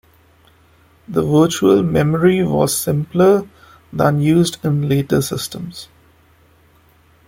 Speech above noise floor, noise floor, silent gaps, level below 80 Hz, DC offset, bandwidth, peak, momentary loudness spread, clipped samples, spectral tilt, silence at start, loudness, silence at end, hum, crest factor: 37 dB; -52 dBFS; none; -48 dBFS; under 0.1%; 16.5 kHz; 0 dBFS; 11 LU; under 0.1%; -6 dB/octave; 1.1 s; -16 LUFS; 1.45 s; none; 16 dB